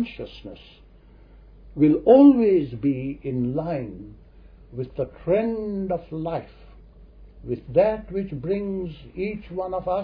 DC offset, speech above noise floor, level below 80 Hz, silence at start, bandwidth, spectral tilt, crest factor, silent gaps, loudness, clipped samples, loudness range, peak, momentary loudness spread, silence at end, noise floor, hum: under 0.1%; 27 dB; -48 dBFS; 0 s; 5 kHz; -11 dB/octave; 20 dB; none; -23 LUFS; under 0.1%; 9 LU; -4 dBFS; 22 LU; 0 s; -50 dBFS; none